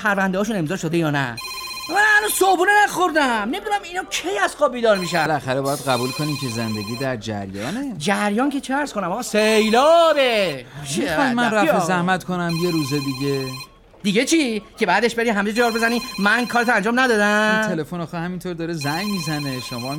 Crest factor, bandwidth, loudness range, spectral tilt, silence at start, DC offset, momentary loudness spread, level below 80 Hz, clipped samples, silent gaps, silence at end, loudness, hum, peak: 14 dB; 17 kHz; 4 LU; -4 dB/octave; 0 s; under 0.1%; 12 LU; -52 dBFS; under 0.1%; none; 0 s; -20 LUFS; none; -6 dBFS